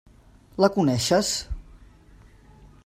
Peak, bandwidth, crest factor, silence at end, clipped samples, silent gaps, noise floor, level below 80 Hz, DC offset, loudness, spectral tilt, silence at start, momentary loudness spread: -4 dBFS; 16 kHz; 22 dB; 1.1 s; under 0.1%; none; -52 dBFS; -44 dBFS; under 0.1%; -22 LUFS; -4.5 dB/octave; 0.6 s; 19 LU